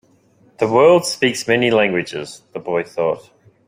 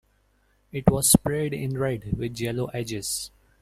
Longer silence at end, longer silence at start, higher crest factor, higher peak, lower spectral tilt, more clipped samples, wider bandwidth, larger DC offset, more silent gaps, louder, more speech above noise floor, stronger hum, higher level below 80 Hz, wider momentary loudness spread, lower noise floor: about the same, 0.45 s vs 0.35 s; second, 0.6 s vs 0.75 s; second, 16 dB vs 24 dB; about the same, -2 dBFS vs -2 dBFS; about the same, -4.5 dB/octave vs -4.5 dB/octave; neither; about the same, 16 kHz vs 16 kHz; neither; neither; first, -17 LUFS vs -25 LUFS; about the same, 37 dB vs 40 dB; neither; second, -60 dBFS vs -44 dBFS; first, 16 LU vs 12 LU; second, -54 dBFS vs -65 dBFS